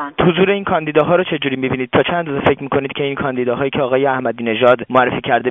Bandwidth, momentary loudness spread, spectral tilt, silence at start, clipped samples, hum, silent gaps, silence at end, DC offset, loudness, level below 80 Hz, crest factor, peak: 3.9 kHz; 6 LU; -4 dB/octave; 0 s; under 0.1%; none; none; 0 s; under 0.1%; -16 LUFS; -48 dBFS; 16 dB; 0 dBFS